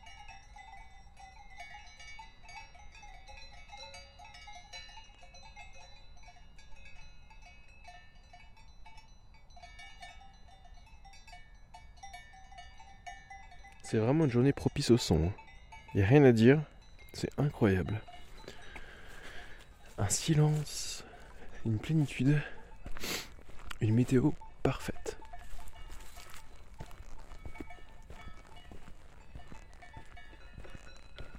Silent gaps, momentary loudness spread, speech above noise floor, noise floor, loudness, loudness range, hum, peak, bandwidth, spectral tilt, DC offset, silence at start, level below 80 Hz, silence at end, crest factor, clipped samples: none; 26 LU; 26 dB; -55 dBFS; -30 LUFS; 26 LU; none; -8 dBFS; 16 kHz; -6 dB/octave; under 0.1%; 0 s; -52 dBFS; 0 s; 26 dB; under 0.1%